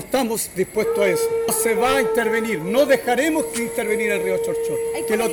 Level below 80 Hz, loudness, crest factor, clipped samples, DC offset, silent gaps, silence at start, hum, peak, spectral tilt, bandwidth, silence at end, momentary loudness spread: -52 dBFS; -20 LUFS; 14 dB; under 0.1%; under 0.1%; none; 0 s; none; -6 dBFS; -3.5 dB/octave; over 20 kHz; 0 s; 6 LU